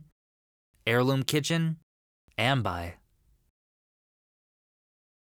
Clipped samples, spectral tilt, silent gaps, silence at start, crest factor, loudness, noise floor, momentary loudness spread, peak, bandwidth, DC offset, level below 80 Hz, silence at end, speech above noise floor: under 0.1%; -5 dB/octave; 1.83-2.28 s; 0.85 s; 26 dB; -28 LUFS; under -90 dBFS; 14 LU; -6 dBFS; 19.5 kHz; under 0.1%; -64 dBFS; 2.4 s; over 63 dB